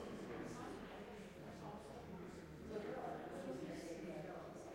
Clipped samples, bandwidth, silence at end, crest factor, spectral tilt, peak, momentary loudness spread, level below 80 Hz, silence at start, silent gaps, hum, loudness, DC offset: under 0.1%; 16 kHz; 0 s; 14 dB; -6 dB/octave; -36 dBFS; 6 LU; -70 dBFS; 0 s; none; none; -51 LUFS; under 0.1%